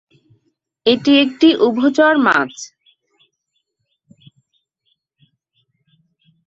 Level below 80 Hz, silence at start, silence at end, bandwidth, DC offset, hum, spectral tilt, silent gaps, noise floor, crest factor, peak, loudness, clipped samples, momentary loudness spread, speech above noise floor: -64 dBFS; 0.85 s; 3.8 s; 7.8 kHz; under 0.1%; none; -4 dB/octave; none; -72 dBFS; 18 dB; -2 dBFS; -14 LUFS; under 0.1%; 13 LU; 59 dB